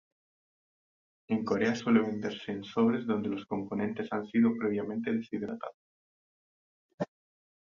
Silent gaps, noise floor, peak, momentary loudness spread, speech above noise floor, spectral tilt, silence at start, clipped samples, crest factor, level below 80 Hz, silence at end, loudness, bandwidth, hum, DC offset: 5.74-6.98 s; under -90 dBFS; -12 dBFS; 13 LU; over 60 dB; -7 dB/octave; 1.3 s; under 0.1%; 20 dB; -70 dBFS; 0.7 s; -31 LUFS; 7.2 kHz; none; under 0.1%